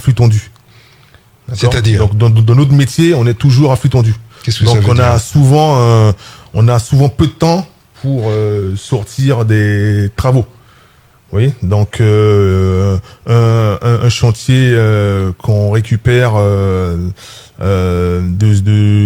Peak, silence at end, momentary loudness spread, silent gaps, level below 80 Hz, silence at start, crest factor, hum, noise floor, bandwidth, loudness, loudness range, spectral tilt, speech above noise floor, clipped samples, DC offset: 0 dBFS; 0 s; 9 LU; none; -36 dBFS; 0 s; 10 dB; none; -45 dBFS; 14.5 kHz; -11 LUFS; 4 LU; -7 dB/octave; 35 dB; under 0.1%; under 0.1%